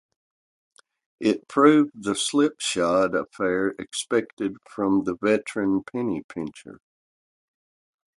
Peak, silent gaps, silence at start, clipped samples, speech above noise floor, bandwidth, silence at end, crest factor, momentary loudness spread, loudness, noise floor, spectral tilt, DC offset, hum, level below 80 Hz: -4 dBFS; 4.33-4.37 s, 6.24-6.29 s; 1.2 s; under 0.1%; over 67 dB; 11.5 kHz; 1.45 s; 20 dB; 12 LU; -24 LUFS; under -90 dBFS; -4.5 dB/octave; under 0.1%; none; -62 dBFS